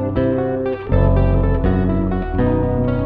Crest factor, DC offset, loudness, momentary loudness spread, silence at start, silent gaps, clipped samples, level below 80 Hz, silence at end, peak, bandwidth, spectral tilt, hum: 14 dB; under 0.1%; -18 LUFS; 5 LU; 0 s; none; under 0.1%; -22 dBFS; 0 s; -2 dBFS; 4.5 kHz; -12 dB/octave; none